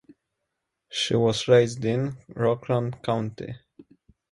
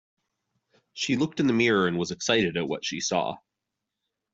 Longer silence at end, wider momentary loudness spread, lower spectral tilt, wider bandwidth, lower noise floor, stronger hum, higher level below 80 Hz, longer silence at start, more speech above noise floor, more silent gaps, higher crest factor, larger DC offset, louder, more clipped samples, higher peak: second, 0.5 s vs 0.95 s; first, 15 LU vs 11 LU; first, -5.5 dB/octave vs -4 dB/octave; first, 11.5 kHz vs 8 kHz; second, -81 dBFS vs -85 dBFS; neither; first, -60 dBFS vs -66 dBFS; about the same, 0.9 s vs 0.95 s; about the same, 57 dB vs 59 dB; neither; about the same, 20 dB vs 20 dB; neither; about the same, -25 LUFS vs -26 LUFS; neither; about the same, -6 dBFS vs -8 dBFS